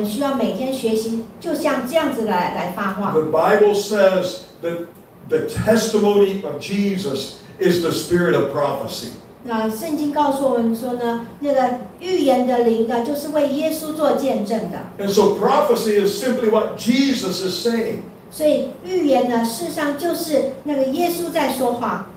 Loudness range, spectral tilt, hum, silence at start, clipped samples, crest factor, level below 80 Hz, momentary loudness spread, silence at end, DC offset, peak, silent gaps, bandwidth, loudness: 3 LU; -5 dB/octave; none; 0 s; under 0.1%; 16 dB; -54 dBFS; 10 LU; 0 s; under 0.1%; -2 dBFS; none; 16 kHz; -19 LUFS